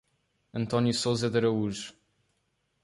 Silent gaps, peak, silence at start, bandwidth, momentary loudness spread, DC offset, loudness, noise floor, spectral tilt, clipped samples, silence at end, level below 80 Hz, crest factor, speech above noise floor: none; -12 dBFS; 0.55 s; 11.5 kHz; 13 LU; under 0.1%; -28 LUFS; -76 dBFS; -5.5 dB/octave; under 0.1%; 0.9 s; -62 dBFS; 18 dB; 48 dB